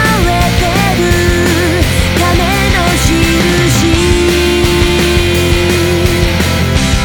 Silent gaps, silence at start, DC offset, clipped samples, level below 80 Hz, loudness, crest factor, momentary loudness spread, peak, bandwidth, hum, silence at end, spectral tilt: none; 0 s; under 0.1%; under 0.1%; -18 dBFS; -10 LUFS; 10 dB; 2 LU; 0 dBFS; over 20 kHz; none; 0 s; -4.5 dB/octave